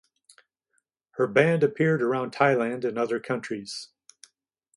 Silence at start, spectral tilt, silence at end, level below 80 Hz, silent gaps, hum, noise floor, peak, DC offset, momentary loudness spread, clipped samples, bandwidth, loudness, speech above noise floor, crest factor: 1.15 s; -6.5 dB/octave; 0.9 s; -72 dBFS; none; none; -75 dBFS; -6 dBFS; under 0.1%; 15 LU; under 0.1%; 11.5 kHz; -25 LUFS; 51 dB; 20 dB